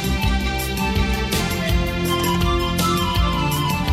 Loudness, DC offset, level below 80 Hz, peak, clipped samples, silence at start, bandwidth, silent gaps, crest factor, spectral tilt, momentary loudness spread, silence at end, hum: -20 LUFS; under 0.1%; -26 dBFS; -4 dBFS; under 0.1%; 0 s; 16 kHz; none; 16 dB; -4.5 dB/octave; 2 LU; 0 s; none